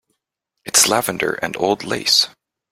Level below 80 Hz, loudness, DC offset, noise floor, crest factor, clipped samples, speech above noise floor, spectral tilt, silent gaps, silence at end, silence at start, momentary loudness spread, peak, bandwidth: -58 dBFS; -17 LUFS; under 0.1%; -78 dBFS; 20 dB; under 0.1%; 59 dB; -1 dB/octave; none; 0.4 s; 0.65 s; 9 LU; 0 dBFS; 16.5 kHz